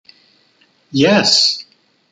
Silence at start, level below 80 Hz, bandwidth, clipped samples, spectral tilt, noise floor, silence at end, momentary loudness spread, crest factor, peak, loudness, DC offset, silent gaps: 0.95 s; -60 dBFS; 11 kHz; under 0.1%; -3 dB/octave; -56 dBFS; 0.5 s; 13 LU; 18 dB; 0 dBFS; -12 LUFS; under 0.1%; none